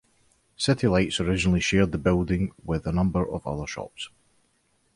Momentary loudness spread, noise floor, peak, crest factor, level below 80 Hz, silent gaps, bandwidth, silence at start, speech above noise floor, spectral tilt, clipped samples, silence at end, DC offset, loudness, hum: 13 LU; -68 dBFS; -8 dBFS; 18 dB; -40 dBFS; none; 11.5 kHz; 0.6 s; 44 dB; -5.5 dB/octave; under 0.1%; 0.9 s; under 0.1%; -25 LUFS; none